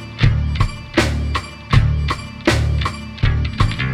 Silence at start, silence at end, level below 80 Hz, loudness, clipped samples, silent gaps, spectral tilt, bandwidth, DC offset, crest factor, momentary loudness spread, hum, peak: 0 s; 0 s; -22 dBFS; -19 LUFS; under 0.1%; none; -6 dB/octave; 12.5 kHz; under 0.1%; 16 dB; 6 LU; none; 0 dBFS